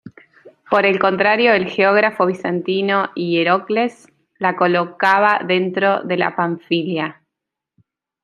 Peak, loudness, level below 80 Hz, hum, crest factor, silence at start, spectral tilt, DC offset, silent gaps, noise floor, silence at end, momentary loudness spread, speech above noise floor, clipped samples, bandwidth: -2 dBFS; -17 LUFS; -66 dBFS; none; 16 dB; 0.05 s; -6.5 dB/octave; under 0.1%; none; -82 dBFS; 1.1 s; 7 LU; 65 dB; under 0.1%; 10 kHz